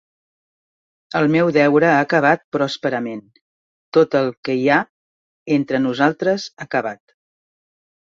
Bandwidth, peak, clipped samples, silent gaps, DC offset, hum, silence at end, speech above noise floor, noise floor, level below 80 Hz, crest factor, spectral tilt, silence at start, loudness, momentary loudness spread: 7.6 kHz; -2 dBFS; under 0.1%; 2.44-2.52 s, 3.41-3.92 s, 4.37-4.43 s, 4.89-5.46 s; under 0.1%; none; 1.1 s; over 73 dB; under -90 dBFS; -64 dBFS; 18 dB; -6.5 dB/octave; 1.1 s; -18 LUFS; 11 LU